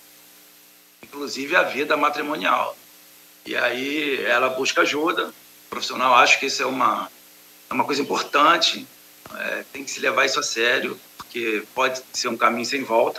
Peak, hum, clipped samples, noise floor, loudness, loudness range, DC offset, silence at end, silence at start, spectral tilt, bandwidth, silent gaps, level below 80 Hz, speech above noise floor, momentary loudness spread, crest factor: 0 dBFS; 60 Hz at -65 dBFS; under 0.1%; -51 dBFS; -21 LUFS; 4 LU; under 0.1%; 0 s; 1.1 s; -1.5 dB/octave; 16 kHz; none; -76 dBFS; 30 dB; 14 LU; 22 dB